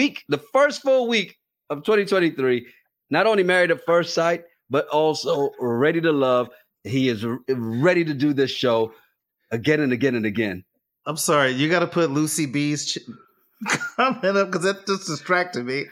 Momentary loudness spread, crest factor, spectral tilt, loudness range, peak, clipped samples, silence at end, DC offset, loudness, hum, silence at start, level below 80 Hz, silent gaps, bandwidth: 9 LU; 18 dB; -4.5 dB/octave; 2 LU; -4 dBFS; under 0.1%; 0.05 s; under 0.1%; -22 LUFS; none; 0 s; -70 dBFS; none; 16 kHz